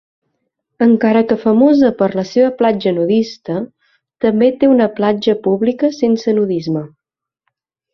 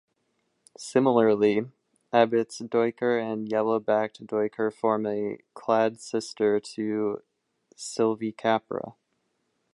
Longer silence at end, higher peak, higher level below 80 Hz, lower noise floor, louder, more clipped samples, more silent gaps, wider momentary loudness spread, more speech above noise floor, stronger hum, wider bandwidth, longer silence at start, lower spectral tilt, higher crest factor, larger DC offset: first, 1.05 s vs 0.8 s; first, -2 dBFS vs -6 dBFS; first, -56 dBFS vs -74 dBFS; about the same, -72 dBFS vs -75 dBFS; first, -14 LUFS vs -26 LUFS; neither; neither; about the same, 11 LU vs 13 LU; first, 59 dB vs 49 dB; neither; second, 6.4 kHz vs 11.5 kHz; about the same, 0.8 s vs 0.8 s; first, -7.5 dB/octave vs -5.5 dB/octave; second, 14 dB vs 20 dB; neither